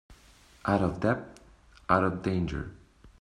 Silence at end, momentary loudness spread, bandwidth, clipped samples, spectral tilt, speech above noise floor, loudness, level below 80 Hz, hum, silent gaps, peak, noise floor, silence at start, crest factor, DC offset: 0.1 s; 17 LU; 11.5 kHz; under 0.1%; -8 dB/octave; 29 dB; -29 LUFS; -50 dBFS; none; none; -8 dBFS; -57 dBFS; 0.1 s; 24 dB; under 0.1%